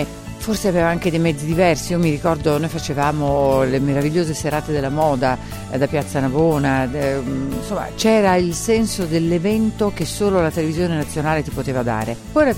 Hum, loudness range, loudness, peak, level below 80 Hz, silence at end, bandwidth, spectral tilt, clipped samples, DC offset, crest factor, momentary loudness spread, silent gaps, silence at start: none; 2 LU; -19 LUFS; -2 dBFS; -36 dBFS; 0 s; 16.5 kHz; -6 dB/octave; under 0.1%; under 0.1%; 16 dB; 6 LU; none; 0 s